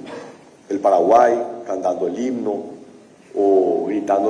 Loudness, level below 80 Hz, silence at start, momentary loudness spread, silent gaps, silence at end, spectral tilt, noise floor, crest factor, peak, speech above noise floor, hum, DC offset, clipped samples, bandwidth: -18 LUFS; -64 dBFS; 0 s; 16 LU; none; 0 s; -6 dB/octave; -45 dBFS; 16 dB; -4 dBFS; 28 dB; none; under 0.1%; under 0.1%; 9.8 kHz